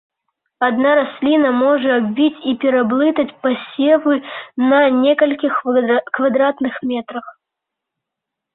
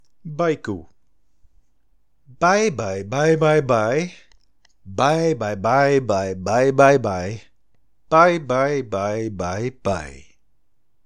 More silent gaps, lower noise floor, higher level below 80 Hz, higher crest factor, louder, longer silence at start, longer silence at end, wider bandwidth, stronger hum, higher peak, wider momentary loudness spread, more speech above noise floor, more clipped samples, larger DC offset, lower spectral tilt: neither; first, -82 dBFS vs -70 dBFS; second, -64 dBFS vs -54 dBFS; second, 14 dB vs 20 dB; first, -16 LUFS vs -19 LUFS; first, 0.6 s vs 0.25 s; first, 1.25 s vs 0.85 s; second, 4.1 kHz vs 10.5 kHz; neither; about the same, -2 dBFS vs 0 dBFS; second, 8 LU vs 14 LU; first, 66 dB vs 51 dB; neither; second, under 0.1% vs 0.5%; first, -10 dB/octave vs -6 dB/octave